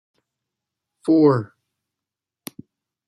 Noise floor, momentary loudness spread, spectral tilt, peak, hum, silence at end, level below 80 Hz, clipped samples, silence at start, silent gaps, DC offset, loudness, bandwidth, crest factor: -87 dBFS; 23 LU; -8 dB/octave; -6 dBFS; none; 1.6 s; -70 dBFS; under 0.1%; 1.05 s; none; under 0.1%; -18 LUFS; 14 kHz; 18 dB